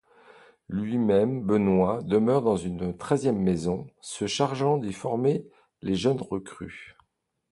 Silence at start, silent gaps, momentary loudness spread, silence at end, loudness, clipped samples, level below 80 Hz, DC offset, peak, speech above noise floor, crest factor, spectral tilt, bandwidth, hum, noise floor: 0.7 s; none; 12 LU; 0.6 s; -26 LUFS; under 0.1%; -54 dBFS; under 0.1%; -8 dBFS; 49 dB; 18 dB; -6.5 dB/octave; 11.5 kHz; none; -75 dBFS